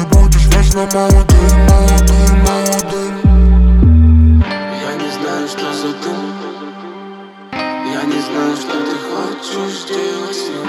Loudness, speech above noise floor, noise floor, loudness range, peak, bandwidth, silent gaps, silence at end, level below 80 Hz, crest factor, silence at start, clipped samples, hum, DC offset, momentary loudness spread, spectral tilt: -13 LUFS; 25 dB; -32 dBFS; 11 LU; 0 dBFS; 16.5 kHz; none; 0 s; -14 dBFS; 12 dB; 0 s; under 0.1%; none; under 0.1%; 15 LU; -5.5 dB/octave